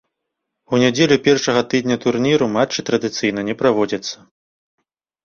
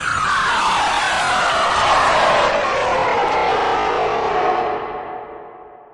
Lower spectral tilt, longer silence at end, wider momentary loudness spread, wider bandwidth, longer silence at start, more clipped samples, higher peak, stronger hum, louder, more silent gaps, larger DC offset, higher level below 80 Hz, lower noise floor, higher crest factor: first, -4.5 dB/octave vs -2.5 dB/octave; first, 1.1 s vs 0.15 s; second, 7 LU vs 13 LU; second, 7.4 kHz vs 11.5 kHz; first, 0.7 s vs 0 s; neither; about the same, -2 dBFS vs -4 dBFS; neither; about the same, -17 LUFS vs -17 LUFS; neither; neither; second, -56 dBFS vs -44 dBFS; first, -78 dBFS vs -39 dBFS; about the same, 18 dB vs 14 dB